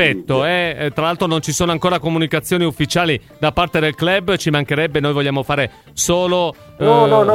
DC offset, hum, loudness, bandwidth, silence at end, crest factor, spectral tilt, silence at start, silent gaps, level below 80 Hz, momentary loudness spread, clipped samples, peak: under 0.1%; none; -17 LUFS; 16.5 kHz; 0 s; 16 dB; -4.5 dB/octave; 0 s; none; -42 dBFS; 4 LU; under 0.1%; 0 dBFS